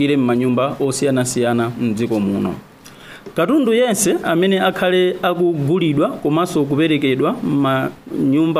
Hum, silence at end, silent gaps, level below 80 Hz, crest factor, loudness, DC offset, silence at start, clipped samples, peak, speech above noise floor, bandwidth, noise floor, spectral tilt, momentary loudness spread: none; 0 s; none; -54 dBFS; 14 dB; -17 LUFS; under 0.1%; 0 s; under 0.1%; -4 dBFS; 23 dB; 15.5 kHz; -39 dBFS; -5.5 dB/octave; 6 LU